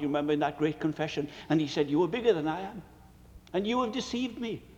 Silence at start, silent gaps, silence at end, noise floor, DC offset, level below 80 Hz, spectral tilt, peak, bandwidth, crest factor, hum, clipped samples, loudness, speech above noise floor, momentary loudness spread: 0 s; none; 0.05 s; -53 dBFS; under 0.1%; -58 dBFS; -6 dB/octave; -12 dBFS; 9 kHz; 18 dB; none; under 0.1%; -30 LUFS; 23 dB; 9 LU